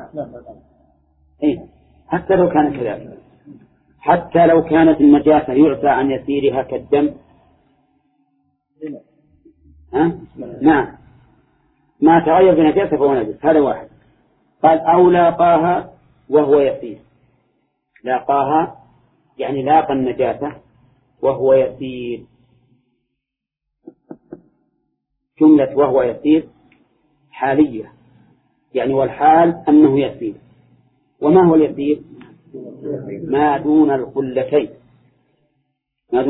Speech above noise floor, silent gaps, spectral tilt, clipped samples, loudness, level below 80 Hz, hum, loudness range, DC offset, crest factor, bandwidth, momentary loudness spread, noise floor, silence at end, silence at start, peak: 67 dB; none; -11.5 dB/octave; under 0.1%; -15 LUFS; -50 dBFS; none; 7 LU; under 0.1%; 16 dB; 4 kHz; 17 LU; -81 dBFS; 0 s; 0 s; 0 dBFS